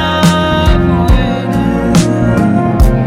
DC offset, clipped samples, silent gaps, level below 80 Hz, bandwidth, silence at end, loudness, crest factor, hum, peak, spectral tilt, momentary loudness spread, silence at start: under 0.1%; under 0.1%; none; -16 dBFS; 15.5 kHz; 0 s; -11 LUFS; 10 dB; none; 0 dBFS; -6.5 dB/octave; 3 LU; 0 s